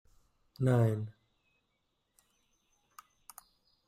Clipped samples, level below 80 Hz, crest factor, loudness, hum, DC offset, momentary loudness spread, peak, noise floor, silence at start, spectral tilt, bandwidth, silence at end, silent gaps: under 0.1%; -68 dBFS; 20 dB; -31 LUFS; none; under 0.1%; 26 LU; -18 dBFS; -80 dBFS; 0.6 s; -8.5 dB/octave; 15 kHz; 2.8 s; none